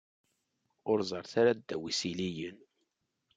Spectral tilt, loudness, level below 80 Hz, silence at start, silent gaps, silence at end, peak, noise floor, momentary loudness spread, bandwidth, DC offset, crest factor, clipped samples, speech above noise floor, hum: -4.5 dB/octave; -33 LUFS; -76 dBFS; 0.85 s; none; 0.8 s; -14 dBFS; -81 dBFS; 14 LU; 9.4 kHz; under 0.1%; 20 dB; under 0.1%; 49 dB; none